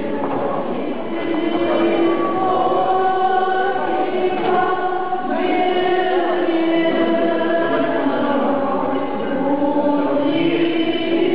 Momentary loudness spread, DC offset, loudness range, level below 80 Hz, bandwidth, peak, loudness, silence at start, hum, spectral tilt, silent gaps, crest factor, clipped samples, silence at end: 5 LU; 4%; 1 LU; -60 dBFS; 5.2 kHz; -8 dBFS; -18 LUFS; 0 s; none; -10.5 dB/octave; none; 10 dB; under 0.1%; 0 s